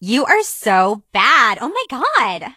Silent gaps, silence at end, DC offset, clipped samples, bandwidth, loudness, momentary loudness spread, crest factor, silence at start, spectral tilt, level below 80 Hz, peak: none; 0.05 s; under 0.1%; under 0.1%; 15.5 kHz; -15 LUFS; 8 LU; 16 dB; 0 s; -2.5 dB/octave; -62 dBFS; 0 dBFS